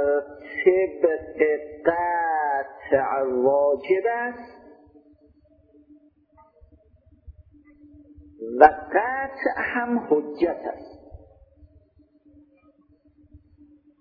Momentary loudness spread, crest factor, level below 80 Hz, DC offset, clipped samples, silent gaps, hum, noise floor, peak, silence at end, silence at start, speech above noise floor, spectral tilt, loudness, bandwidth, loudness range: 15 LU; 26 dB; -56 dBFS; under 0.1%; under 0.1%; none; none; -59 dBFS; 0 dBFS; 0.65 s; 0 s; 37 dB; -8.5 dB/octave; -23 LUFS; 5.4 kHz; 8 LU